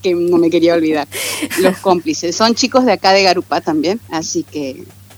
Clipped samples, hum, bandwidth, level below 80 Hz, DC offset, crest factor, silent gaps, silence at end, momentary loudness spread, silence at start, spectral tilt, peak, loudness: under 0.1%; none; 19 kHz; -58 dBFS; under 0.1%; 14 dB; none; 0.3 s; 9 LU; 0.05 s; -3.5 dB/octave; 0 dBFS; -14 LUFS